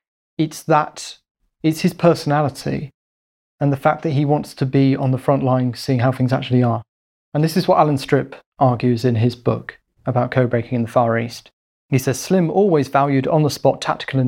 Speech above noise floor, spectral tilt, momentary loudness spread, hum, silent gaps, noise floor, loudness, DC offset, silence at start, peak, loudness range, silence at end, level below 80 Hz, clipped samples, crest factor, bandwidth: over 73 dB; -7 dB/octave; 10 LU; none; 1.31-1.35 s, 2.94-3.58 s, 6.88-7.32 s, 8.46-8.52 s, 11.53-11.89 s; under -90 dBFS; -18 LUFS; under 0.1%; 0.4 s; -2 dBFS; 2 LU; 0 s; -54 dBFS; under 0.1%; 16 dB; 16.5 kHz